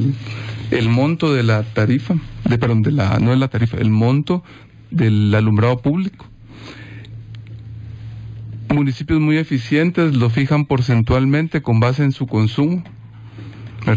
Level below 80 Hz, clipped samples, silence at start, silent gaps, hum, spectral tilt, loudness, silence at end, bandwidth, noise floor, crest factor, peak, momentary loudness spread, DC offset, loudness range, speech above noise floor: -38 dBFS; under 0.1%; 0 s; none; none; -8.5 dB/octave; -17 LUFS; 0 s; 7.8 kHz; -37 dBFS; 14 dB; -4 dBFS; 19 LU; under 0.1%; 6 LU; 21 dB